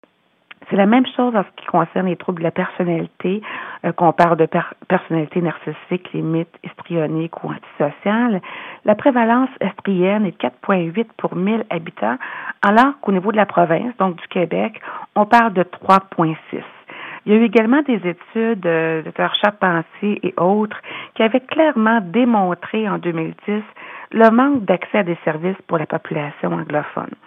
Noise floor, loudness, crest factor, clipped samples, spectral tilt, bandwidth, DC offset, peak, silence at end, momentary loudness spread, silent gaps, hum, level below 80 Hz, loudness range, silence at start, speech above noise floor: -48 dBFS; -18 LUFS; 18 dB; under 0.1%; -8 dB/octave; 7 kHz; under 0.1%; 0 dBFS; 0.15 s; 11 LU; none; none; -68 dBFS; 3 LU; 0.7 s; 30 dB